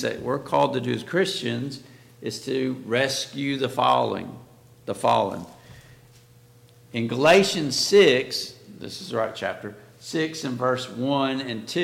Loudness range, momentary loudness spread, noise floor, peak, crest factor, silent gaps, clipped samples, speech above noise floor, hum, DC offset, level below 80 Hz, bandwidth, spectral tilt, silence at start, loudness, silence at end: 6 LU; 19 LU; -53 dBFS; -6 dBFS; 18 dB; none; under 0.1%; 29 dB; none; under 0.1%; -64 dBFS; 16.5 kHz; -4 dB/octave; 0 s; -23 LUFS; 0 s